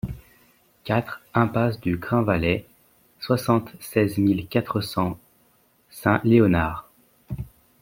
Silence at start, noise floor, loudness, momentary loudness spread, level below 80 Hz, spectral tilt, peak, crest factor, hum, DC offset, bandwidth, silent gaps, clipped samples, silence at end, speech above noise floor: 0.05 s; -62 dBFS; -23 LUFS; 19 LU; -48 dBFS; -7 dB/octave; -2 dBFS; 22 dB; none; under 0.1%; 16.5 kHz; none; under 0.1%; 0.35 s; 40 dB